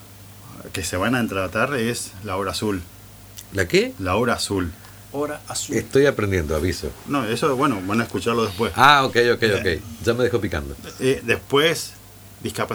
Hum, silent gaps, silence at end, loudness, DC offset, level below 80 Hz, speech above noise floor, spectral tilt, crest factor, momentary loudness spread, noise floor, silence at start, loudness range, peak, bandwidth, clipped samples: 50 Hz at -50 dBFS; none; 0 s; -21 LUFS; under 0.1%; -44 dBFS; 21 dB; -4.5 dB/octave; 22 dB; 13 LU; -42 dBFS; 0 s; 5 LU; 0 dBFS; over 20 kHz; under 0.1%